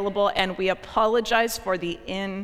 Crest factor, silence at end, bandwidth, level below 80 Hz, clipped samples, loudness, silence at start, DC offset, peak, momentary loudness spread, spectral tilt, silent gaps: 18 dB; 0 s; 16.5 kHz; -48 dBFS; under 0.1%; -24 LUFS; 0 s; under 0.1%; -6 dBFS; 9 LU; -4 dB/octave; none